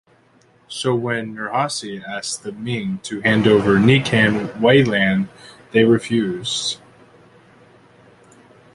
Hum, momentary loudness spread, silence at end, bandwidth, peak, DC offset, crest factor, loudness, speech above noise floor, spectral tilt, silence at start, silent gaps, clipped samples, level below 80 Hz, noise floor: none; 13 LU; 2 s; 11.5 kHz; -2 dBFS; under 0.1%; 18 dB; -18 LUFS; 37 dB; -5 dB/octave; 0.7 s; none; under 0.1%; -52 dBFS; -55 dBFS